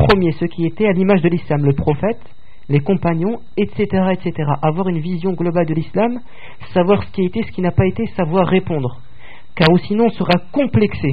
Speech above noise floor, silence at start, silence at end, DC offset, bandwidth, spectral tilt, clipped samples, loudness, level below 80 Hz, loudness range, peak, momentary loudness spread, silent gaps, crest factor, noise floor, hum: 26 dB; 0 s; 0 s; 4%; 5 kHz; -6.5 dB/octave; under 0.1%; -17 LUFS; -38 dBFS; 2 LU; 0 dBFS; 7 LU; none; 16 dB; -43 dBFS; none